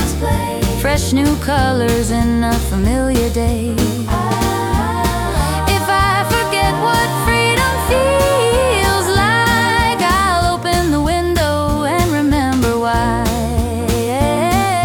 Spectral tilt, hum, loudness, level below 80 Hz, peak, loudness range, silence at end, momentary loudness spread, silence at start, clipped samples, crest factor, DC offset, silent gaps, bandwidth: -5 dB/octave; none; -15 LUFS; -24 dBFS; -2 dBFS; 3 LU; 0 s; 4 LU; 0 s; under 0.1%; 12 dB; under 0.1%; none; over 20 kHz